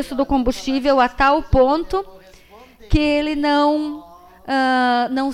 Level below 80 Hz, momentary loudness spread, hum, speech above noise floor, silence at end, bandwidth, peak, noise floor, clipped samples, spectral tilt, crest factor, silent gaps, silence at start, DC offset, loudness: -32 dBFS; 10 LU; none; 28 dB; 0 s; 14 kHz; -4 dBFS; -45 dBFS; under 0.1%; -6 dB/octave; 14 dB; none; 0 s; under 0.1%; -18 LUFS